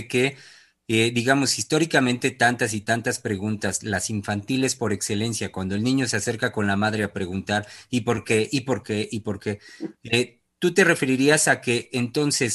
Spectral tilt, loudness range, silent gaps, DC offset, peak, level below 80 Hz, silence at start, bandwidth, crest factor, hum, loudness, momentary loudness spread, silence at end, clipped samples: -4 dB/octave; 4 LU; none; under 0.1%; -4 dBFS; -60 dBFS; 0 s; 12.5 kHz; 20 dB; none; -23 LUFS; 9 LU; 0 s; under 0.1%